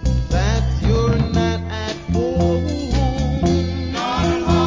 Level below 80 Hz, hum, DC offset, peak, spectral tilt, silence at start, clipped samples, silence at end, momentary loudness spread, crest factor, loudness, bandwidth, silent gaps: -24 dBFS; none; under 0.1%; -4 dBFS; -6.5 dB/octave; 0 s; under 0.1%; 0 s; 5 LU; 14 dB; -19 LUFS; 7.6 kHz; none